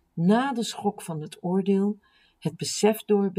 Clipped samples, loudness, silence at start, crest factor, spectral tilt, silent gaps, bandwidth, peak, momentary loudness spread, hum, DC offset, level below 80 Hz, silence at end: under 0.1%; -26 LUFS; 0.15 s; 18 dB; -5.5 dB/octave; none; 16 kHz; -8 dBFS; 12 LU; none; under 0.1%; -74 dBFS; 0.05 s